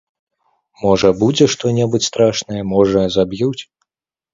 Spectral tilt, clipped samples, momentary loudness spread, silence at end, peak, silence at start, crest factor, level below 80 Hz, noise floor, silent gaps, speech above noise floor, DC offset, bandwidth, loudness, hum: -5 dB/octave; under 0.1%; 8 LU; 0.7 s; 0 dBFS; 0.8 s; 16 dB; -46 dBFS; -86 dBFS; none; 71 dB; under 0.1%; 7.8 kHz; -15 LUFS; none